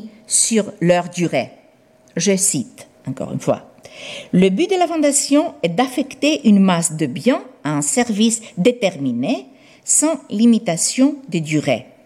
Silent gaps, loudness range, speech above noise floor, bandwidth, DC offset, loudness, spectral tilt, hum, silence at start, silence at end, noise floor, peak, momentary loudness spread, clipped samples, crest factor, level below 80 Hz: none; 4 LU; 34 dB; 15 kHz; under 0.1%; -17 LUFS; -4 dB/octave; none; 0 s; 0.25 s; -51 dBFS; -2 dBFS; 11 LU; under 0.1%; 16 dB; -62 dBFS